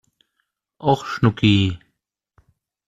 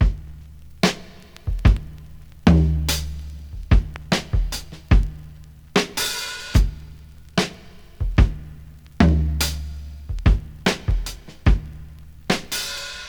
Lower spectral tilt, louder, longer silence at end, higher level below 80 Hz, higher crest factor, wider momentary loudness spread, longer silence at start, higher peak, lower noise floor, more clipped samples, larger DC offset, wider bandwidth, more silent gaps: first, -7 dB/octave vs -5 dB/octave; first, -19 LUFS vs -22 LUFS; first, 1.1 s vs 0 s; second, -50 dBFS vs -24 dBFS; about the same, 20 dB vs 20 dB; second, 9 LU vs 21 LU; first, 0.8 s vs 0 s; about the same, -4 dBFS vs -2 dBFS; first, -74 dBFS vs -42 dBFS; neither; second, under 0.1% vs 0.2%; second, 8 kHz vs over 20 kHz; neither